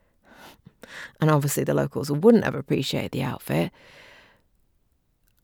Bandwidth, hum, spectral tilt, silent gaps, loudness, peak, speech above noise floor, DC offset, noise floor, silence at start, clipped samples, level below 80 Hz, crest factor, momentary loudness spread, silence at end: 19.5 kHz; none; -6 dB/octave; none; -23 LUFS; -4 dBFS; 44 dB; under 0.1%; -67 dBFS; 0.45 s; under 0.1%; -58 dBFS; 22 dB; 13 LU; 1.75 s